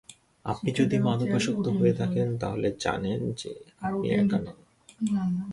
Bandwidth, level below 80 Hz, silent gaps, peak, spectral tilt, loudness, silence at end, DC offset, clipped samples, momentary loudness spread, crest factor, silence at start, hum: 11.5 kHz; -56 dBFS; none; -12 dBFS; -6.5 dB/octave; -27 LUFS; 0 s; under 0.1%; under 0.1%; 11 LU; 16 dB; 0.1 s; none